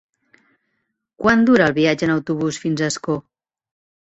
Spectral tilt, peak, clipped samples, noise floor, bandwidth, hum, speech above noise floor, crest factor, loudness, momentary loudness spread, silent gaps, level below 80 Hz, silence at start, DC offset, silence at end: -5.5 dB/octave; -2 dBFS; under 0.1%; -73 dBFS; 8.2 kHz; none; 56 dB; 18 dB; -18 LUFS; 10 LU; none; -56 dBFS; 1.2 s; under 0.1%; 0.95 s